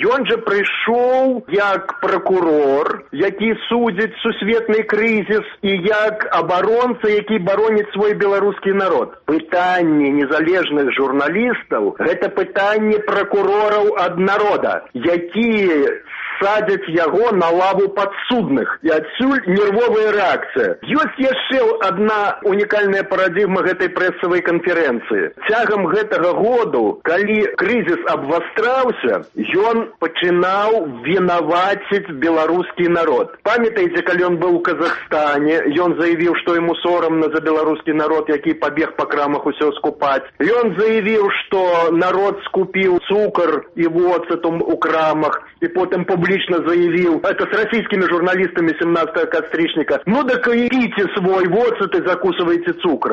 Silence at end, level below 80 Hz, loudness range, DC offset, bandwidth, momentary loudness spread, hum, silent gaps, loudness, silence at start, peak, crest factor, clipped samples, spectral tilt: 0 s; -56 dBFS; 1 LU; under 0.1%; 7.4 kHz; 4 LU; none; none; -16 LUFS; 0 s; -4 dBFS; 12 dB; under 0.1%; -7 dB/octave